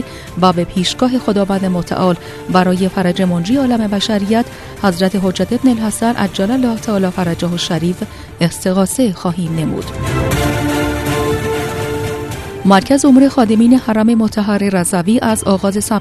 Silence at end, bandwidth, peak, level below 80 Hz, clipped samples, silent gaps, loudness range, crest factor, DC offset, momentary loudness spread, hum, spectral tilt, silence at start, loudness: 0 s; 14 kHz; 0 dBFS; -36 dBFS; under 0.1%; none; 5 LU; 14 dB; under 0.1%; 8 LU; none; -5.5 dB/octave; 0 s; -14 LUFS